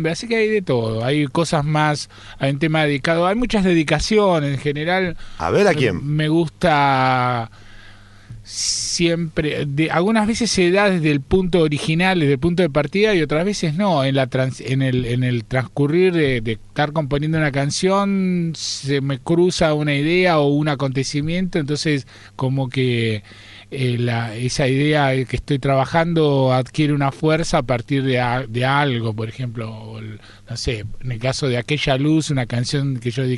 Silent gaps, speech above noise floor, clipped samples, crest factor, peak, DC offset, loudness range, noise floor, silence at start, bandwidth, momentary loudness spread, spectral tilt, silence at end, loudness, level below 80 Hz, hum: none; 24 dB; under 0.1%; 16 dB; -2 dBFS; under 0.1%; 4 LU; -42 dBFS; 0 s; 11.5 kHz; 8 LU; -5.5 dB/octave; 0 s; -19 LUFS; -40 dBFS; none